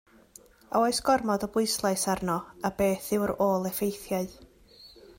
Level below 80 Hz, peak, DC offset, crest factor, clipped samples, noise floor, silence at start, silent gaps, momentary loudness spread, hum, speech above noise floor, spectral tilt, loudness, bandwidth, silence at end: -56 dBFS; -12 dBFS; under 0.1%; 18 dB; under 0.1%; -55 dBFS; 0.7 s; none; 7 LU; none; 28 dB; -4.5 dB/octave; -28 LUFS; 16.5 kHz; 0.05 s